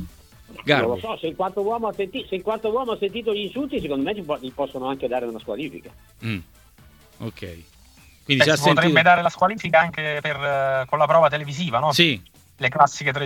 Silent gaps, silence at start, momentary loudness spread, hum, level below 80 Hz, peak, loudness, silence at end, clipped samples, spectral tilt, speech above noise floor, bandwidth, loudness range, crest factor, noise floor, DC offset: none; 0 s; 15 LU; none; -54 dBFS; 0 dBFS; -21 LUFS; 0 s; under 0.1%; -4.5 dB/octave; 29 dB; 18 kHz; 11 LU; 22 dB; -51 dBFS; under 0.1%